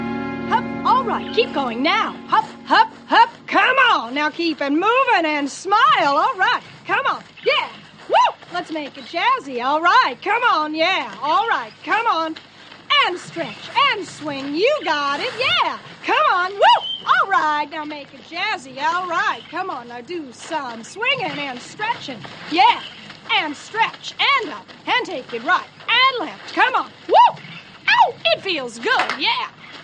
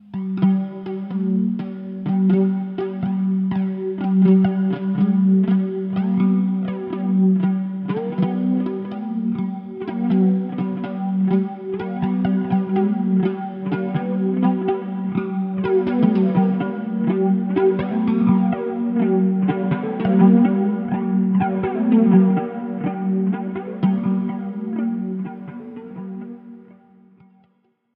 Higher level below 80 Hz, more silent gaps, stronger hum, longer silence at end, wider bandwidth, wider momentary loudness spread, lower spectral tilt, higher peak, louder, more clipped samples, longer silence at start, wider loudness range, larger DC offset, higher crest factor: about the same, -62 dBFS vs -60 dBFS; neither; neither; second, 0 s vs 1.35 s; first, 9.8 kHz vs 3.8 kHz; about the same, 13 LU vs 11 LU; second, -3 dB/octave vs -12.5 dB/octave; about the same, -2 dBFS vs -2 dBFS; about the same, -18 LUFS vs -20 LUFS; neither; about the same, 0 s vs 0.1 s; about the same, 5 LU vs 6 LU; neither; about the same, 16 dB vs 18 dB